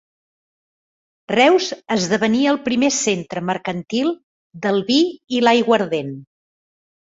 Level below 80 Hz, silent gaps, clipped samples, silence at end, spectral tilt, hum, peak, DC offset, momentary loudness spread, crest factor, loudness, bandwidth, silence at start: -62 dBFS; 4.23-4.51 s; under 0.1%; 0.8 s; -4 dB/octave; none; -2 dBFS; under 0.1%; 10 LU; 18 dB; -18 LUFS; 8 kHz; 1.3 s